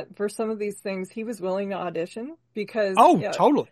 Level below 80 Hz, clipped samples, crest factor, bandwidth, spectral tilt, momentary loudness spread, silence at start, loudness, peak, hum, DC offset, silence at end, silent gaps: -72 dBFS; under 0.1%; 20 dB; 12.5 kHz; -5.5 dB/octave; 15 LU; 0 s; -24 LUFS; -4 dBFS; none; under 0.1%; 0.05 s; none